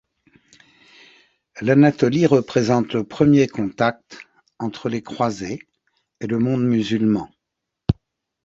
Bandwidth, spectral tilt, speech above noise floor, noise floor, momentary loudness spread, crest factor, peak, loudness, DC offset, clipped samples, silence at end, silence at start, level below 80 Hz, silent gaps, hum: 7.8 kHz; -7 dB/octave; 63 dB; -81 dBFS; 15 LU; 20 dB; -2 dBFS; -20 LUFS; under 0.1%; under 0.1%; 0.55 s; 1.55 s; -46 dBFS; none; none